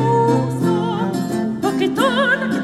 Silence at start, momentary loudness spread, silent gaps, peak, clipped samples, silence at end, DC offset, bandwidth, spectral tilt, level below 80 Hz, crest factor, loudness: 0 s; 6 LU; none; -2 dBFS; under 0.1%; 0 s; under 0.1%; 14.5 kHz; -6 dB/octave; -54 dBFS; 14 dB; -18 LUFS